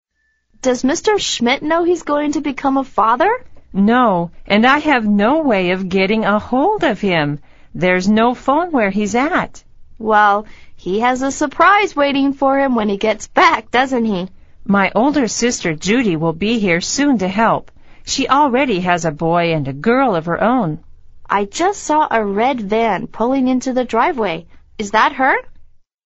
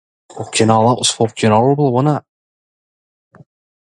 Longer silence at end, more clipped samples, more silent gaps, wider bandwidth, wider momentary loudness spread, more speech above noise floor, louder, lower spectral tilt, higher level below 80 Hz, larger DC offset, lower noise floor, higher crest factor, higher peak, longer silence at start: second, 0.4 s vs 1.6 s; neither; neither; second, 8 kHz vs 11.5 kHz; about the same, 7 LU vs 9 LU; second, 49 dB vs over 76 dB; about the same, -15 LUFS vs -14 LUFS; second, -3.5 dB/octave vs -5 dB/octave; first, -42 dBFS vs -56 dBFS; neither; second, -64 dBFS vs under -90 dBFS; about the same, 16 dB vs 16 dB; about the same, 0 dBFS vs 0 dBFS; first, 0.65 s vs 0.35 s